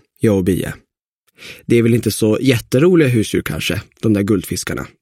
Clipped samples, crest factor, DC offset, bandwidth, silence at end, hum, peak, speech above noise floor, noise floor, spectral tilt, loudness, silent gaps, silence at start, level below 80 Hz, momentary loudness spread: under 0.1%; 16 dB; under 0.1%; 16.5 kHz; 0.15 s; none; 0 dBFS; 50 dB; -66 dBFS; -6 dB/octave; -16 LUFS; 1.08-1.27 s; 0.2 s; -42 dBFS; 11 LU